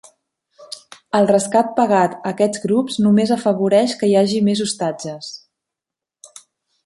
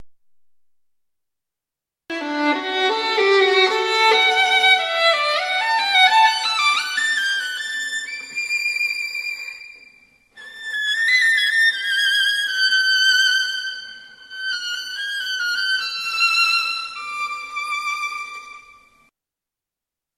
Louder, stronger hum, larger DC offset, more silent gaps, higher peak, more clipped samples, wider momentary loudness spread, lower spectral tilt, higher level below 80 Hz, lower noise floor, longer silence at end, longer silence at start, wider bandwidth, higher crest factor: about the same, -17 LUFS vs -18 LUFS; neither; neither; neither; about the same, -2 dBFS vs -2 dBFS; neither; first, 18 LU vs 13 LU; first, -5.5 dB/octave vs 1 dB/octave; first, -62 dBFS vs -70 dBFS; about the same, -86 dBFS vs -87 dBFS; about the same, 1.5 s vs 1.55 s; first, 0.6 s vs 0 s; second, 11.5 kHz vs 15 kHz; about the same, 16 dB vs 18 dB